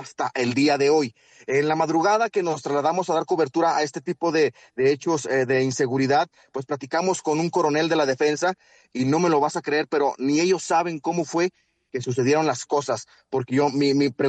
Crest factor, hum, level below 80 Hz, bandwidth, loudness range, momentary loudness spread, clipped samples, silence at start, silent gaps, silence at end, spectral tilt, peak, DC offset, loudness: 14 dB; none; -68 dBFS; 9.2 kHz; 2 LU; 8 LU; under 0.1%; 0 s; none; 0 s; -5 dB/octave; -8 dBFS; under 0.1%; -23 LUFS